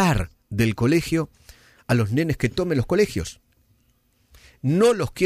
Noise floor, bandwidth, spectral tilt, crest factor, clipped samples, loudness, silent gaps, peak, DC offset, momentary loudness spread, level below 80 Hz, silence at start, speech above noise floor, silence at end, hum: -64 dBFS; 15.5 kHz; -6.5 dB/octave; 16 dB; under 0.1%; -22 LUFS; none; -8 dBFS; under 0.1%; 11 LU; -42 dBFS; 0 s; 43 dB; 0 s; none